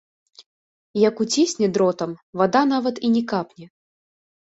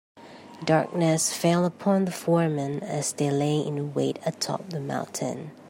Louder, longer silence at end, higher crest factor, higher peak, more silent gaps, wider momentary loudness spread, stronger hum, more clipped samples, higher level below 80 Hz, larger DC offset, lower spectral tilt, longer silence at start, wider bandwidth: first, -21 LUFS vs -26 LUFS; first, 0.9 s vs 0 s; about the same, 18 dB vs 18 dB; first, -4 dBFS vs -8 dBFS; first, 0.46-0.94 s, 2.23-2.33 s vs none; about the same, 10 LU vs 9 LU; neither; neither; about the same, -66 dBFS vs -70 dBFS; neither; about the same, -4.5 dB/octave vs -5 dB/octave; first, 0.4 s vs 0.15 s; second, 8.2 kHz vs 16 kHz